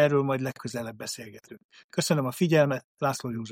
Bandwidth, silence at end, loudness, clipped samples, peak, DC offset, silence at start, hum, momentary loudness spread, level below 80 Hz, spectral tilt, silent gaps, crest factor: 16 kHz; 0 s; -28 LUFS; under 0.1%; -8 dBFS; under 0.1%; 0 s; none; 13 LU; -68 dBFS; -5.5 dB/octave; 1.64-1.69 s, 1.84-1.89 s, 2.84-2.95 s; 18 dB